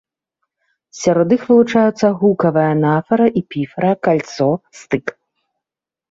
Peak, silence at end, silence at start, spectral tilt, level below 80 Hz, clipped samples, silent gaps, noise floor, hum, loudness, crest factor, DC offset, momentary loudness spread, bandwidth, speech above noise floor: -2 dBFS; 1 s; 0.95 s; -7 dB/octave; -58 dBFS; under 0.1%; none; -87 dBFS; none; -16 LUFS; 14 dB; under 0.1%; 10 LU; 7.8 kHz; 72 dB